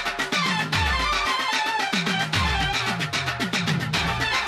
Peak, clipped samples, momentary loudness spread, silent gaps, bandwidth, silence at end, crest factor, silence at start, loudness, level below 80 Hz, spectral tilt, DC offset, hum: -8 dBFS; under 0.1%; 2 LU; none; 14 kHz; 0 s; 16 dB; 0 s; -23 LUFS; -38 dBFS; -3.5 dB/octave; under 0.1%; none